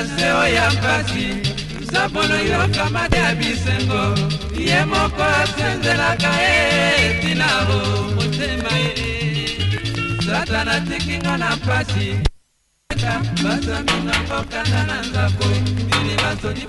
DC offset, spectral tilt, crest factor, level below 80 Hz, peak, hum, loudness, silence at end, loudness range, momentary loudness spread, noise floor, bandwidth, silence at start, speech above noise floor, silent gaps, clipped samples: under 0.1%; -4.5 dB/octave; 18 dB; -32 dBFS; 0 dBFS; none; -18 LUFS; 0 s; 5 LU; 7 LU; -63 dBFS; 11.5 kHz; 0 s; 45 dB; none; under 0.1%